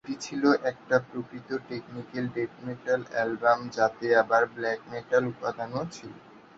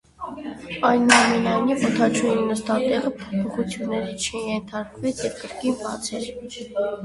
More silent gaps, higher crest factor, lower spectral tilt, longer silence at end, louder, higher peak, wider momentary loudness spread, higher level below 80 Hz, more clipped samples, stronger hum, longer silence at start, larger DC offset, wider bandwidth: neither; about the same, 20 dB vs 22 dB; first, -5.5 dB/octave vs -4 dB/octave; first, 0.2 s vs 0 s; second, -28 LUFS vs -22 LUFS; second, -8 dBFS vs 0 dBFS; about the same, 14 LU vs 16 LU; second, -68 dBFS vs -54 dBFS; neither; neither; second, 0.05 s vs 0.2 s; neither; second, 8 kHz vs 11.5 kHz